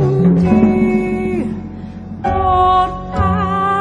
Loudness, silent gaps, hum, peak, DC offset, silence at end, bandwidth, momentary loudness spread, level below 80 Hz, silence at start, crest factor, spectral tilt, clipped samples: -15 LUFS; none; none; -2 dBFS; under 0.1%; 0 s; 10 kHz; 14 LU; -30 dBFS; 0 s; 14 dB; -9 dB/octave; under 0.1%